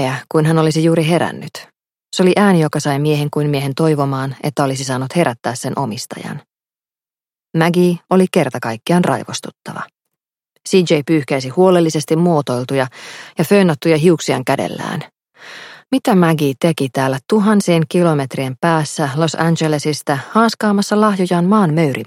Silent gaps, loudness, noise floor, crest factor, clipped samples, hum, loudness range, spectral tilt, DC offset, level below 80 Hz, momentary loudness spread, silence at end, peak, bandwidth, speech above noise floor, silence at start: none; -15 LUFS; under -90 dBFS; 16 dB; under 0.1%; none; 4 LU; -6 dB/octave; under 0.1%; -60 dBFS; 13 LU; 0 s; 0 dBFS; 16 kHz; over 75 dB; 0 s